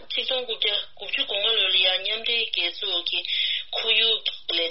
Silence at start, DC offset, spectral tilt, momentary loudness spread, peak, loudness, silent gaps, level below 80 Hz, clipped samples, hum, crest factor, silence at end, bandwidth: 0 s; 0.7%; 4 dB/octave; 6 LU; -8 dBFS; -22 LUFS; none; -68 dBFS; under 0.1%; none; 18 dB; 0 s; 6 kHz